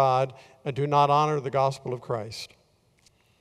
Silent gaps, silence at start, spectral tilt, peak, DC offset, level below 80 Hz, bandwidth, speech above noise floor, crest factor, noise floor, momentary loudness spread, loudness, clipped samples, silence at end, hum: none; 0 s; -6 dB/octave; -8 dBFS; under 0.1%; -66 dBFS; 12.5 kHz; 38 dB; 18 dB; -63 dBFS; 16 LU; -26 LUFS; under 0.1%; 0.95 s; none